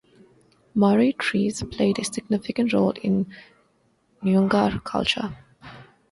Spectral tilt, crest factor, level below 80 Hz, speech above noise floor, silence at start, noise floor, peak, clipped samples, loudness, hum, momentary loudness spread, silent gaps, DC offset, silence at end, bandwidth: -5.5 dB/octave; 18 dB; -52 dBFS; 43 dB; 0.75 s; -65 dBFS; -6 dBFS; under 0.1%; -23 LUFS; none; 10 LU; none; under 0.1%; 0.3 s; 11.5 kHz